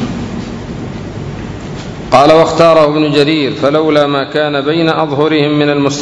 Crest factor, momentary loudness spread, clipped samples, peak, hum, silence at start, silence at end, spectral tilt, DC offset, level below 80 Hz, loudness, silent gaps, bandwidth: 12 dB; 16 LU; 1%; 0 dBFS; none; 0 s; 0 s; -6 dB/octave; under 0.1%; -36 dBFS; -10 LUFS; none; 11 kHz